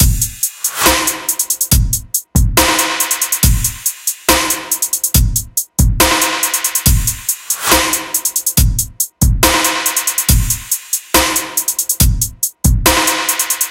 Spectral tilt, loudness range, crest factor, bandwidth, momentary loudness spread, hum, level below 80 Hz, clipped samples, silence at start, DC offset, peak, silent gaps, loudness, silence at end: -2.5 dB/octave; 1 LU; 14 dB; 17.5 kHz; 6 LU; none; -20 dBFS; under 0.1%; 0 s; under 0.1%; 0 dBFS; none; -13 LUFS; 0 s